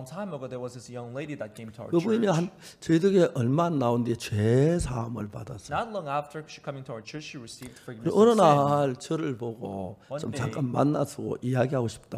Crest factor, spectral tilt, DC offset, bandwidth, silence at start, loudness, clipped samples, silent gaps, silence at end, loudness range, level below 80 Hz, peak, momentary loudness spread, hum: 22 dB; -7 dB/octave; under 0.1%; 15 kHz; 0 s; -26 LUFS; under 0.1%; none; 0 s; 5 LU; -54 dBFS; -6 dBFS; 17 LU; none